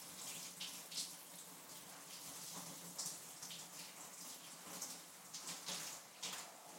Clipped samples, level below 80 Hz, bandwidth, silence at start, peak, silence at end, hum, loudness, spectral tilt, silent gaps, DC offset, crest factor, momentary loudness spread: under 0.1%; under -90 dBFS; 16.5 kHz; 0 s; -30 dBFS; 0 s; none; -48 LUFS; -0.5 dB/octave; none; under 0.1%; 20 dB; 7 LU